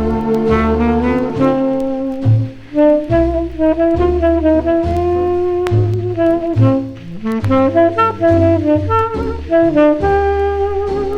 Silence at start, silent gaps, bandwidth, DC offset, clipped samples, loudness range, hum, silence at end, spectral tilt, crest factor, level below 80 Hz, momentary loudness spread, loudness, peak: 0 s; none; 8.4 kHz; under 0.1%; under 0.1%; 2 LU; none; 0 s; -9 dB/octave; 14 dB; -28 dBFS; 6 LU; -14 LUFS; 0 dBFS